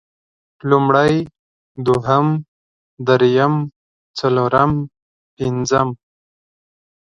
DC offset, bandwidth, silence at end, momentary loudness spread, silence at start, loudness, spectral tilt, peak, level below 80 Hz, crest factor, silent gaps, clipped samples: under 0.1%; 10.5 kHz; 1.1 s; 15 LU; 0.65 s; -17 LUFS; -6.5 dB/octave; 0 dBFS; -50 dBFS; 18 dB; 1.39-1.75 s, 2.48-2.97 s, 3.76-4.14 s, 5.02-5.37 s; under 0.1%